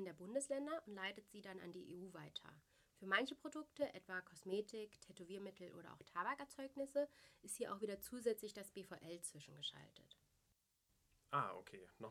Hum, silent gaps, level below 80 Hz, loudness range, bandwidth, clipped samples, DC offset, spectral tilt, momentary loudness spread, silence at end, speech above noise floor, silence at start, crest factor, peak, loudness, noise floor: none; none; -84 dBFS; 4 LU; 16.5 kHz; under 0.1%; under 0.1%; -3.5 dB/octave; 14 LU; 0 s; 35 dB; 0 s; 26 dB; -22 dBFS; -48 LUFS; -83 dBFS